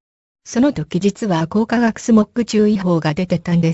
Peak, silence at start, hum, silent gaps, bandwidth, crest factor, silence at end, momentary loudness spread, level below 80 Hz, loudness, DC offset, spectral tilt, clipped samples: -2 dBFS; 0.45 s; none; none; 8 kHz; 14 dB; 0 s; 5 LU; -48 dBFS; -17 LUFS; under 0.1%; -6.5 dB/octave; under 0.1%